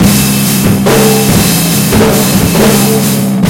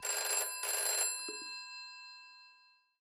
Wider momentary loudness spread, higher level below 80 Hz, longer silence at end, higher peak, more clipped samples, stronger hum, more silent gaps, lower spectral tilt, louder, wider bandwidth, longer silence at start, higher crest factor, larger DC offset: second, 2 LU vs 19 LU; first, -26 dBFS vs under -90 dBFS; second, 0 s vs 0.45 s; first, 0 dBFS vs -22 dBFS; first, 1% vs under 0.1%; neither; neither; first, -4.5 dB/octave vs 4 dB/octave; first, -7 LUFS vs -34 LUFS; about the same, over 20 kHz vs over 20 kHz; about the same, 0 s vs 0 s; second, 8 dB vs 18 dB; neither